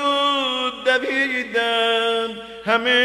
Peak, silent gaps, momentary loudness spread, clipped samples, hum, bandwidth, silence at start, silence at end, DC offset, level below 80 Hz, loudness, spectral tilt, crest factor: -6 dBFS; none; 5 LU; under 0.1%; none; 13.5 kHz; 0 s; 0 s; under 0.1%; -60 dBFS; -20 LUFS; -2.5 dB/octave; 14 dB